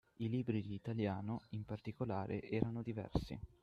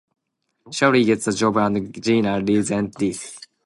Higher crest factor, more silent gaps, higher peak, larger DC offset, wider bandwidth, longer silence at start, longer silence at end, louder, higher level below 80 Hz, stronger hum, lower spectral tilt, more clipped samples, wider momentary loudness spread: first, 24 dB vs 18 dB; neither; second, -18 dBFS vs -4 dBFS; neither; second, 7.8 kHz vs 11.5 kHz; second, 0.2 s vs 0.65 s; about the same, 0.15 s vs 0.25 s; second, -42 LUFS vs -20 LUFS; about the same, -58 dBFS vs -56 dBFS; neither; first, -9 dB/octave vs -5 dB/octave; neither; second, 6 LU vs 9 LU